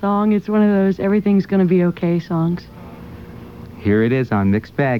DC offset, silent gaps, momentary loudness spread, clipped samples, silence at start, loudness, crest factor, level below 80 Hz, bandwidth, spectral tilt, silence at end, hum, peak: 0.2%; none; 21 LU; under 0.1%; 0 s; -17 LUFS; 12 dB; -48 dBFS; 6 kHz; -9.5 dB/octave; 0 s; none; -6 dBFS